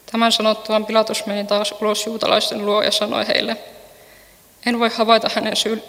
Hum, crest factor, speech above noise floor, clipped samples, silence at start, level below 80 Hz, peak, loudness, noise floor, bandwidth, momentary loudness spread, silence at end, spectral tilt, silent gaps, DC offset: none; 20 dB; 30 dB; under 0.1%; 0.1 s; -62 dBFS; 0 dBFS; -18 LUFS; -48 dBFS; 16.5 kHz; 6 LU; 0 s; -3 dB/octave; none; under 0.1%